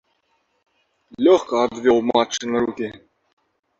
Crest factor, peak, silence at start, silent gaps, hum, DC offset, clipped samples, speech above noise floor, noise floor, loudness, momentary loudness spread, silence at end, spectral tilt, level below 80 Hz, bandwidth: 18 dB; -4 dBFS; 1.2 s; none; none; under 0.1%; under 0.1%; 49 dB; -68 dBFS; -19 LUFS; 9 LU; 0.85 s; -4 dB/octave; -60 dBFS; 7.8 kHz